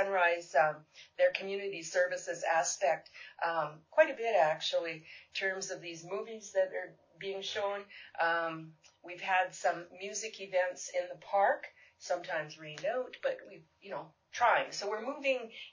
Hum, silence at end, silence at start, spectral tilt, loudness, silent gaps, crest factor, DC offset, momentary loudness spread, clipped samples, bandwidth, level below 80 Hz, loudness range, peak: none; 0.05 s; 0 s; -2 dB/octave; -34 LUFS; none; 22 dB; under 0.1%; 16 LU; under 0.1%; 7.6 kHz; -84 dBFS; 5 LU; -12 dBFS